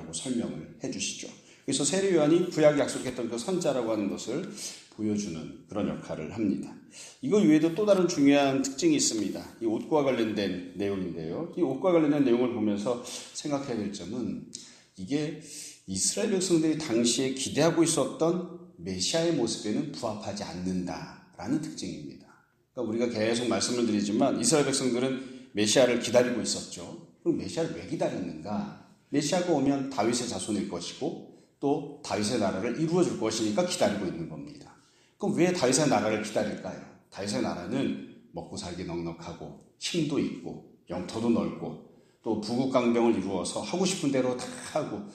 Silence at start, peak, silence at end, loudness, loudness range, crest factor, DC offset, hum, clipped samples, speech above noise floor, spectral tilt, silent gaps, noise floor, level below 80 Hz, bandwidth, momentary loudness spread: 0 s; -8 dBFS; 0 s; -28 LUFS; 7 LU; 20 dB; under 0.1%; none; under 0.1%; 33 dB; -4.5 dB/octave; none; -61 dBFS; -64 dBFS; 14 kHz; 16 LU